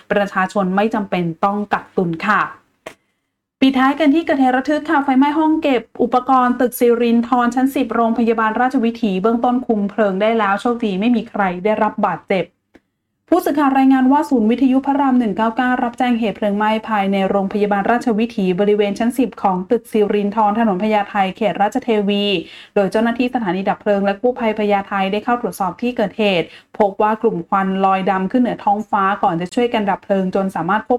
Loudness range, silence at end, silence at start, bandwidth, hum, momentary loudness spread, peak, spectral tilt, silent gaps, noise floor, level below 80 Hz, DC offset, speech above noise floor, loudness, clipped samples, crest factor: 3 LU; 0 s; 0.1 s; 13.5 kHz; none; 5 LU; -4 dBFS; -6.5 dB/octave; none; -73 dBFS; -54 dBFS; under 0.1%; 56 dB; -17 LUFS; under 0.1%; 14 dB